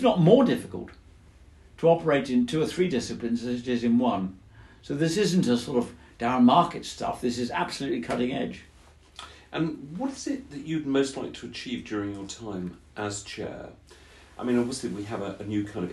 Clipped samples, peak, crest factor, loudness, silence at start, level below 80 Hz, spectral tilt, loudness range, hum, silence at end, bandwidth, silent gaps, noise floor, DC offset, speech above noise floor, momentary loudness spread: under 0.1%; -4 dBFS; 22 dB; -27 LUFS; 0 s; -56 dBFS; -6 dB/octave; 8 LU; none; 0 s; 12.5 kHz; none; -54 dBFS; under 0.1%; 28 dB; 15 LU